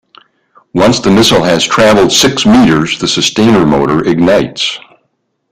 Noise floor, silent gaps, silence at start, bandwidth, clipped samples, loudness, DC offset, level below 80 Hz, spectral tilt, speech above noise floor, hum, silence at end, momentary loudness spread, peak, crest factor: -63 dBFS; none; 0.75 s; 16 kHz; under 0.1%; -8 LUFS; under 0.1%; -38 dBFS; -4 dB/octave; 54 dB; none; 0.75 s; 7 LU; 0 dBFS; 10 dB